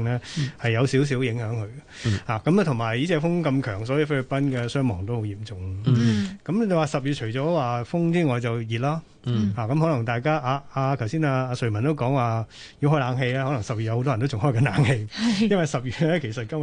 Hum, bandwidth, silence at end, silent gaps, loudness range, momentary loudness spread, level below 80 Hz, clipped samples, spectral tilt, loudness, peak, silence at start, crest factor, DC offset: none; 10 kHz; 0 s; none; 1 LU; 7 LU; -50 dBFS; under 0.1%; -7 dB/octave; -24 LUFS; -8 dBFS; 0 s; 16 dB; under 0.1%